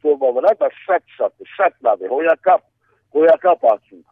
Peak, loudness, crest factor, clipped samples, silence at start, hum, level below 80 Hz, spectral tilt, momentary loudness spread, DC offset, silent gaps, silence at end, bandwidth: -2 dBFS; -17 LUFS; 14 dB; under 0.1%; 0.05 s; none; -74 dBFS; -6.5 dB/octave; 10 LU; under 0.1%; none; 0.35 s; 4.5 kHz